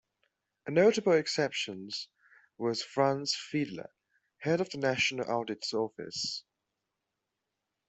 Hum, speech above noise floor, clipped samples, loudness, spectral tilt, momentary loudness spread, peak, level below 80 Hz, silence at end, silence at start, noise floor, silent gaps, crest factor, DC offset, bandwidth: none; 55 dB; under 0.1%; -31 LUFS; -4 dB/octave; 13 LU; -12 dBFS; -74 dBFS; 1.5 s; 0.65 s; -86 dBFS; none; 20 dB; under 0.1%; 8.2 kHz